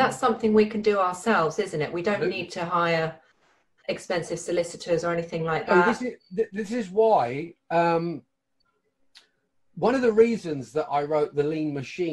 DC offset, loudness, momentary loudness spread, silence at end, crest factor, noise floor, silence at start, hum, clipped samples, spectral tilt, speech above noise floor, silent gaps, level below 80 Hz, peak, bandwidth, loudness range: under 0.1%; -25 LUFS; 10 LU; 0 s; 18 dB; -74 dBFS; 0 s; none; under 0.1%; -5.5 dB/octave; 49 dB; none; -62 dBFS; -6 dBFS; 12 kHz; 3 LU